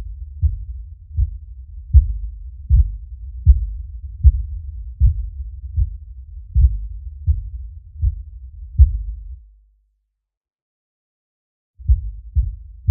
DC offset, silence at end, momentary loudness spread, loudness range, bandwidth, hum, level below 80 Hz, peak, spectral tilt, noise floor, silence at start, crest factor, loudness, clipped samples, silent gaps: under 0.1%; 0 s; 20 LU; 8 LU; 0.3 kHz; none; -20 dBFS; 0 dBFS; -17 dB/octave; -71 dBFS; 0 s; 20 dB; -21 LUFS; under 0.1%; 10.37-10.41 s, 10.53-11.74 s